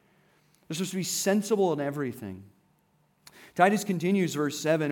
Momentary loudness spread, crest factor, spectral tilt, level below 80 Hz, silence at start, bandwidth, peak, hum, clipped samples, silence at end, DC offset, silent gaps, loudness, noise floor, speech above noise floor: 15 LU; 22 dB; -4.5 dB/octave; -80 dBFS; 0.7 s; 18.5 kHz; -8 dBFS; none; under 0.1%; 0 s; under 0.1%; none; -27 LUFS; -68 dBFS; 41 dB